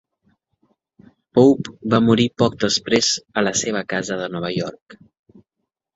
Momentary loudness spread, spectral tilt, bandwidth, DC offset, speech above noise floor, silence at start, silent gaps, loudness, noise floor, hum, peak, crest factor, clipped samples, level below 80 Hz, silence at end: 10 LU; -4 dB/octave; 8 kHz; under 0.1%; 61 dB; 1.35 s; 4.82-4.86 s; -19 LUFS; -79 dBFS; none; -2 dBFS; 18 dB; under 0.1%; -54 dBFS; 1 s